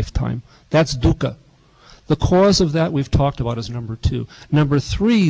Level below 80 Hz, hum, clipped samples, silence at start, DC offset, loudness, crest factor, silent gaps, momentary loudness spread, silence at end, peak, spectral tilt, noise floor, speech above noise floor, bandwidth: -30 dBFS; none; under 0.1%; 0 s; under 0.1%; -19 LUFS; 12 dB; none; 11 LU; 0 s; -6 dBFS; -6.5 dB/octave; -48 dBFS; 31 dB; 8 kHz